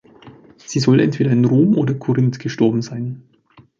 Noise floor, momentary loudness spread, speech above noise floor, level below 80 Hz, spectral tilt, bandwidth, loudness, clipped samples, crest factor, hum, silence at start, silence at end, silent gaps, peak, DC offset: -44 dBFS; 13 LU; 27 dB; -58 dBFS; -7.5 dB/octave; 7.6 kHz; -17 LUFS; under 0.1%; 16 dB; none; 0.25 s; 0.6 s; none; -2 dBFS; under 0.1%